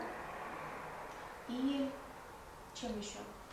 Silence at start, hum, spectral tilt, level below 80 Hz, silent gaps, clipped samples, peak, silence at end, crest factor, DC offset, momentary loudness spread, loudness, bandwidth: 0 s; none; -4 dB/octave; -64 dBFS; none; under 0.1%; -26 dBFS; 0 s; 18 dB; under 0.1%; 14 LU; -43 LUFS; 16 kHz